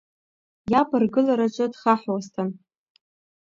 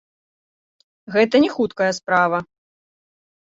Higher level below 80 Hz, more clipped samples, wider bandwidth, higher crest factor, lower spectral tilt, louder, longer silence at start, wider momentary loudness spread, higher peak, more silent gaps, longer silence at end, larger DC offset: about the same, -62 dBFS vs -62 dBFS; neither; about the same, 7.6 kHz vs 7.8 kHz; about the same, 20 dB vs 18 dB; first, -7 dB/octave vs -5 dB/octave; second, -23 LUFS vs -19 LUFS; second, 0.65 s vs 1.1 s; first, 10 LU vs 7 LU; about the same, -4 dBFS vs -4 dBFS; neither; about the same, 0.9 s vs 1 s; neither